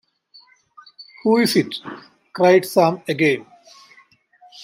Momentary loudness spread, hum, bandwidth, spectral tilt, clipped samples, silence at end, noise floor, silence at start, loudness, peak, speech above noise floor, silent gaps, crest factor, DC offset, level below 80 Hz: 20 LU; none; 16 kHz; -5 dB/octave; under 0.1%; 0 s; -54 dBFS; 1 s; -18 LUFS; -2 dBFS; 37 dB; none; 18 dB; under 0.1%; -70 dBFS